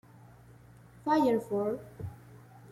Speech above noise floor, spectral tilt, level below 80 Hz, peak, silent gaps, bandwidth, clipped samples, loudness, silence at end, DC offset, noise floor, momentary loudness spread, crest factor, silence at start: 26 dB; -7 dB/octave; -64 dBFS; -16 dBFS; none; 15.5 kHz; under 0.1%; -30 LUFS; 0 s; under 0.1%; -55 dBFS; 18 LU; 18 dB; 1.05 s